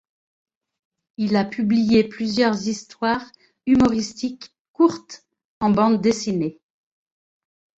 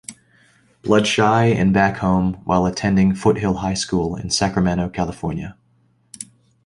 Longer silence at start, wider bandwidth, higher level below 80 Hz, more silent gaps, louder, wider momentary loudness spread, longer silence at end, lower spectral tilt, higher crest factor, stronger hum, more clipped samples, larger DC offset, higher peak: first, 1.2 s vs 0.1 s; second, 8 kHz vs 11.5 kHz; second, -52 dBFS vs -40 dBFS; first, 4.60-4.74 s, 5.45-5.61 s vs none; second, -21 LUFS vs -18 LUFS; second, 13 LU vs 18 LU; first, 1.25 s vs 0.4 s; about the same, -5.5 dB/octave vs -5.5 dB/octave; about the same, 18 dB vs 16 dB; neither; neither; neither; about the same, -4 dBFS vs -2 dBFS